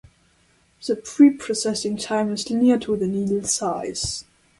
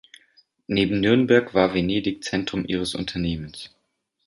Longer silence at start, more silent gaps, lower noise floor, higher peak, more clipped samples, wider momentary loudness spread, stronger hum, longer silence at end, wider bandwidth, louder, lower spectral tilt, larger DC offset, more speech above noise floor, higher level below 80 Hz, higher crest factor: about the same, 0.8 s vs 0.7 s; neither; second, -60 dBFS vs -73 dBFS; about the same, -4 dBFS vs -4 dBFS; neither; about the same, 11 LU vs 13 LU; neither; second, 0.4 s vs 0.6 s; about the same, 11.5 kHz vs 11.5 kHz; about the same, -21 LUFS vs -22 LUFS; second, -4 dB/octave vs -6 dB/octave; neither; second, 39 dB vs 51 dB; about the same, -52 dBFS vs -48 dBFS; about the same, 18 dB vs 20 dB